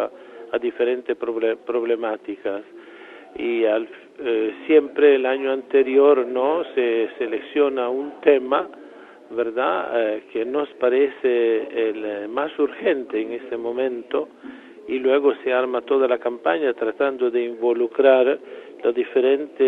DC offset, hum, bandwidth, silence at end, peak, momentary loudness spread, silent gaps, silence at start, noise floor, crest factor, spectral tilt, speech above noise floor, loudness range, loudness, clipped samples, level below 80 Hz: under 0.1%; none; 4 kHz; 0 s; -2 dBFS; 12 LU; none; 0 s; -43 dBFS; 20 dB; -6.5 dB/octave; 23 dB; 6 LU; -21 LUFS; under 0.1%; -70 dBFS